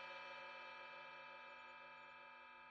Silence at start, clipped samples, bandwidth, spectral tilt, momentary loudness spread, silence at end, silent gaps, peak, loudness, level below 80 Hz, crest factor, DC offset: 0 s; under 0.1%; 8.4 kHz; -3 dB/octave; 6 LU; 0 s; none; -42 dBFS; -55 LUFS; under -90 dBFS; 14 dB; under 0.1%